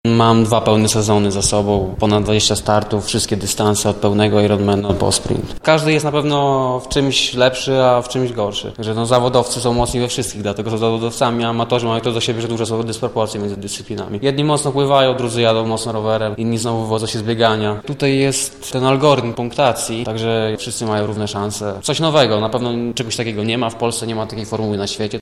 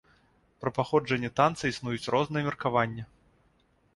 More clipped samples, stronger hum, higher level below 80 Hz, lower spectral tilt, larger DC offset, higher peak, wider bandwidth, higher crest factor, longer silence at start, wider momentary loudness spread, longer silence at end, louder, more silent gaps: neither; neither; first, -40 dBFS vs -60 dBFS; second, -4.5 dB/octave vs -6 dB/octave; neither; first, 0 dBFS vs -8 dBFS; first, 15 kHz vs 11.5 kHz; second, 16 dB vs 22 dB; second, 0.05 s vs 0.6 s; about the same, 8 LU vs 8 LU; second, 0 s vs 0.9 s; first, -17 LUFS vs -29 LUFS; neither